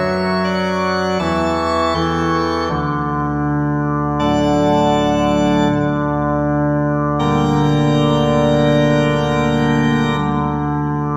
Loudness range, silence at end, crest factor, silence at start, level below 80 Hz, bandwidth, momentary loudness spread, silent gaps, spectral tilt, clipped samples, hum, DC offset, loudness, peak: 3 LU; 0 s; 14 dB; 0 s; -36 dBFS; 9.2 kHz; 4 LU; none; -7 dB/octave; under 0.1%; none; 0.4%; -16 LUFS; -2 dBFS